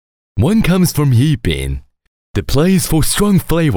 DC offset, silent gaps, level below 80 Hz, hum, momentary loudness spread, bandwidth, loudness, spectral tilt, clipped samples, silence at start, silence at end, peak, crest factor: under 0.1%; 2.08-2.34 s; -26 dBFS; none; 11 LU; over 20 kHz; -14 LUFS; -5.5 dB/octave; under 0.1%; 0.35 s; 0 s; -2 dBFS; 12 dB